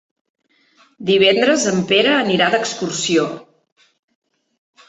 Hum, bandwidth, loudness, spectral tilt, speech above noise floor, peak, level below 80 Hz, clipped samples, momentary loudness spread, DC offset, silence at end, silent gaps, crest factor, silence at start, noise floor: none; 8.4 kHz; -16 LUFS; -3.5 dB/octave; 40 dB; -2 dBFS; -62 dBFS; under 0.1%; 10 LU; under 0.1%; 1.45 s; none; 18 dB; 1 s; -56 dBFS